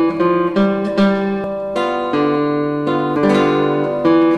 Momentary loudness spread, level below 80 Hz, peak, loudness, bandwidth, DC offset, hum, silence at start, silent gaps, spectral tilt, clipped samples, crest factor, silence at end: 5 LU; -50 dBFS; -4 dBFS; -16 LUFS; 10 kHz; under 0.1%; none; 0 s; none; -7.5 dB/octave; under 0.1%; 12 dB; 0 s